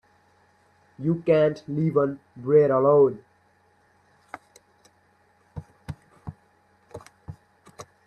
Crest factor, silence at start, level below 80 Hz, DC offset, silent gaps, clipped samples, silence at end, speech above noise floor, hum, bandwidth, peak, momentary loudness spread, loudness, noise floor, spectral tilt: 20 dB; 1 s; -60 dBFS; under 0.1%; none; under 0.1%; 0.25 s; 42 dB; none; 9 kHz; -8 dBFS; 27 LU; -22 LUFS; -63 dBFS; -8.5 dB/octave